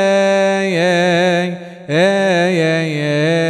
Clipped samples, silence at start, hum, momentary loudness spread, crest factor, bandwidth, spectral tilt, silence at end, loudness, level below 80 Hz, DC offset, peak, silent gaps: under 0.1%; 0 s; none; 5 LU; 12 dB; 12 kHz; -5.5 dB/octave; 0 s; -14 LUFS; -64 dBFS; under 0.1%; -2 dBFS; none